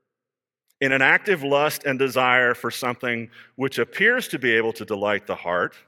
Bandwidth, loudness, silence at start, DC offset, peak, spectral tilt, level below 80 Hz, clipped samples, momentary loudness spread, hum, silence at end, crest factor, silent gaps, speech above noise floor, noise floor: 17.5 kHz; -21 LUFS; 0.8 s; under 0.1%; -2 dBFS; -4 dB/octave; -72 dBFS; under 0.1%; 9 LU; none; 0.2 s; 20 dB; none; 67 dB; -89 dBFS